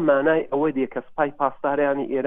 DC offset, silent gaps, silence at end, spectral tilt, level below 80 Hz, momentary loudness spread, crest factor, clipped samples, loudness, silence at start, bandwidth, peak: under 0.1%; none; 0 s; -9.5 dB/octave; -60 dBFS; 7 LU; 16 dB; under 0.1%; -23 LUFS; 0 s; 3.8 kHz; -6 dBFS